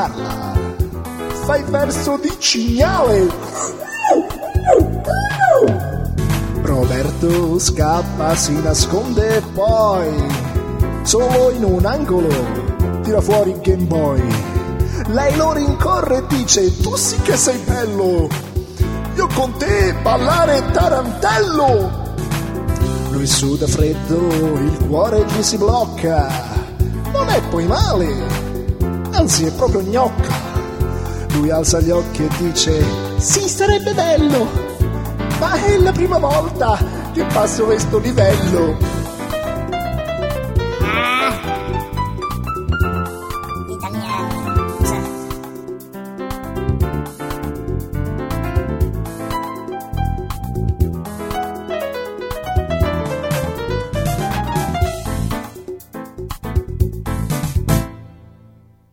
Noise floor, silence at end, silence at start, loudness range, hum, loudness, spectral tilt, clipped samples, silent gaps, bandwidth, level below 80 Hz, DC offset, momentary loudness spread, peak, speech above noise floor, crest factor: -47 dBFS; 0.65 s; 0 s; 7 LU; none; -17 LUFS; -5 dB/octave; under 0.1%; none; 16.5 kHz; -26 dBFS; under 0.1%; 10 LU; 0 dBFS; 32 dB; 16 dB